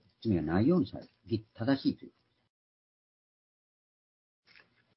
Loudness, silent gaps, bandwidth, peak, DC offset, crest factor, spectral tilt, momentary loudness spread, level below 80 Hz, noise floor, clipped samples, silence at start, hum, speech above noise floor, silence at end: -31 LUFS; none; 5.8 kHz; -14 dBFS; under 0.1%; 20 dB; -11 dB/octave; 11 LU; -62 dBFS; -64 dBFS; under 0.1%; 0.25 s; none; 33 dB; 2.9 s